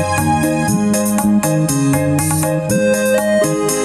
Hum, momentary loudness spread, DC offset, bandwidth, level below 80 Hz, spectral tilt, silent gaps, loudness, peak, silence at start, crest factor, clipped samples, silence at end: none; 1 LU; under 0.1%; 15.5 kHz; -42 dBFS; -5 dB/octave; none; -15 LUFS; -4 dBFS; 0 s; 10 dB; under 0.1%; 0 s